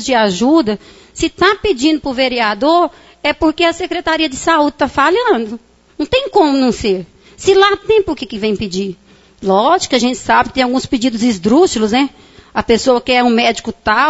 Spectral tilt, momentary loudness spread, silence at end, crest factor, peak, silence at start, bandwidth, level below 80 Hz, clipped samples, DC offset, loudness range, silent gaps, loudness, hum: -4 dB/octave; 9 LU; 0 s; 14 dB; 0 dBFS; 0 s; 8 kHz; -40 dBFS; under 0.1%; under 0.1%; 1 LU; none; -14 LUFS; none